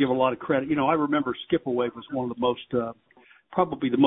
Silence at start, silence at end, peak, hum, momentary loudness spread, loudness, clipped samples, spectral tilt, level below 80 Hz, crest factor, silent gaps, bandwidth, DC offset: 0 s; 0 s; -6 dBFS; none; 8 LU; -26 LUFS; under 0.1%; -10.5 dB/octave; -60 dBFS; 20 dB; none; 4 kHz; under 0.1%